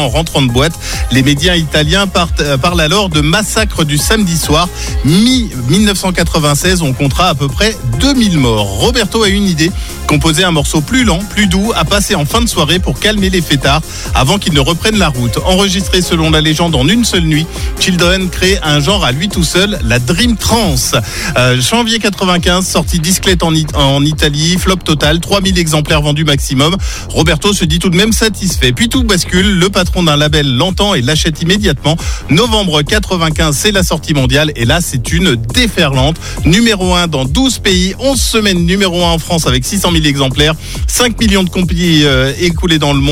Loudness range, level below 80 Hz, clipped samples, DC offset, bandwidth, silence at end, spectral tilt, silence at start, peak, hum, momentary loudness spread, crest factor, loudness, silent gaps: 1 LU; -20 dBFS; under 0.1%; under 0.1%; 17 kHz; 0 s; -4 dB/octave; 0 s; 0 dBFS; none; 3 LU; 10 dB; -10 LUFS; none